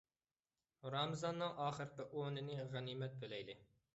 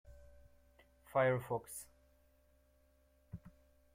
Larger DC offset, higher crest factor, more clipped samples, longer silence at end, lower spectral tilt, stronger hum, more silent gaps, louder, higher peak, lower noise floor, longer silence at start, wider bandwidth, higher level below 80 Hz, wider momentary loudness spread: neither; about the same, 20 dB vs 22 dB; neither; second, 0.3 s vs 0.45 s; about the same, -4.5 dB/octave vs -5.5 dB/octave; neither; neither; second, -45 LUFS vs -38 LUFS; second, -28 dBFS vs -22 dBFS; first, under -90 dBFS vs -71 dBFS; first, 0.85 s vs 0.1 s; second, 8 kHz vs 16.5 kHz; second, -80 dBFS vs -68 dBFS; second, 9 LU vs 22 LU